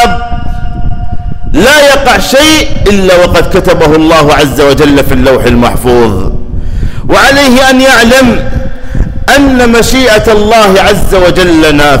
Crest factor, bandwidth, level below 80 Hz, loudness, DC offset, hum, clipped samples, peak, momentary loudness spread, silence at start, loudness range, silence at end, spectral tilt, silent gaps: 4 dB; 16.5 kHz; -14 dBFS; -4 LUFS; under 0.1%; none; 0.4%; 0 dBFS; 14 LU; 0 s; 2 LU; 0 s; -4.5 dB/octave; none